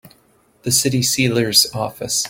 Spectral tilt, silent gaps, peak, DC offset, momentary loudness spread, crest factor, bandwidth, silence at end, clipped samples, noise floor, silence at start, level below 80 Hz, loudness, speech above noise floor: -3 dB/octave; none; 0 dBFS; under 0.1%; 9 LU; 20 dB; 17 kHz; 0 s; under 0.1%; -56 dBFS; 0.05 s; -52 dBFS; -16 LUFS; 38 dB